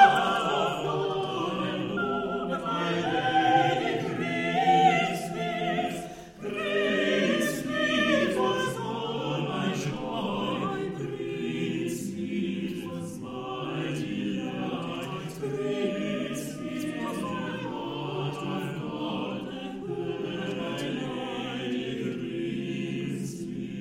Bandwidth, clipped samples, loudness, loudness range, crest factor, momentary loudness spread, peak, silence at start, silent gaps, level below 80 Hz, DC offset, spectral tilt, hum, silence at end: 16 kHz; under 0.1%; -29 LUFS; 7 LU; 24 dB; 10 LU; -6 dBFS; 0 s; none; -60 dBFS; under 0.1%; -5 dB/octave; none; 0 s